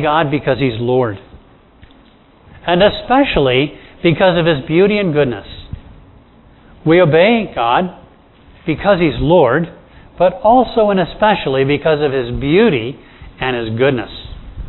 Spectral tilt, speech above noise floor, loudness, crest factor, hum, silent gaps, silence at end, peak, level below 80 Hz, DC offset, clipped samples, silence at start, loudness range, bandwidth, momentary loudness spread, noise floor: -10 dB/octave; 33 dB; -14 LUFS; 14 dB; none; none; 0 s; 0 dBFS; -36 dBFS; under 0.1%; under 0.1%; 0 s; 3 LU; 4.2 kHz; 15 LU; -46 dBFS